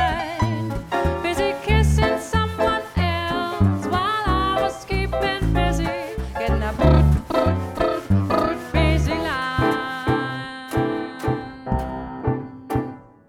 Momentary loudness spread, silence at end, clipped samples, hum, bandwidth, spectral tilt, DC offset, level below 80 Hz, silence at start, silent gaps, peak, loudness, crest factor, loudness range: 8 LU; 0.25 s; under 0.1%; none; 15 kHz; -6.5 dB/octave; under 0.1%; -28 dBFS; 0 s; none; -2 dBFS; -22 LUFS; 18 dB; 4 LU